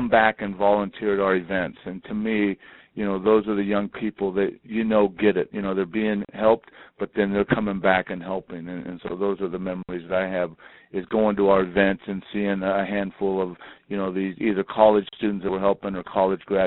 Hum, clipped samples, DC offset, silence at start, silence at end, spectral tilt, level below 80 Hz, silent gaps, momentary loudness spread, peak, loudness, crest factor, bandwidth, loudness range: none; under 0.1%; under 0.1%; 0 s; 0 s; -5 dB/octave; -54 dBFS; none; 12 LU; -2 dBFS; -24 LUFS; 22 dB; 4.1 kHz; 2 LU